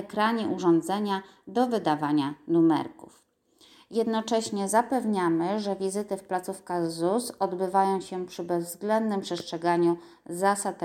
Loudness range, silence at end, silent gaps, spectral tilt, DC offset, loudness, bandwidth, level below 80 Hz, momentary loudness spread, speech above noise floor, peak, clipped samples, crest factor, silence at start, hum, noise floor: 2 LU; 0 s; none; -5 dB/octave; under 0.1%; -27 LUFS; 15.5 kHz; -72 dBFS; 8 LU; 34 dB; -10 dBFS; under 0.1%; 18 dB; 0 s; none; -61 dBFS